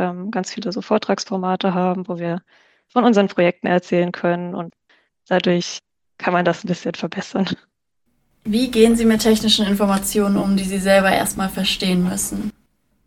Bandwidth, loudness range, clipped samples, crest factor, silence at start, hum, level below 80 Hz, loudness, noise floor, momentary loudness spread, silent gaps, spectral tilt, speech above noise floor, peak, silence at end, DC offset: 18 kHz; 6 LU; under 0.1%; 18 dB; 0 s; none; -46 dBFS; -19 LUFS; -71 dBFS; 12 LU; none; -4.5 dB/octave; 52 dB; -2 dBFS; 0.55 s; under 0.1%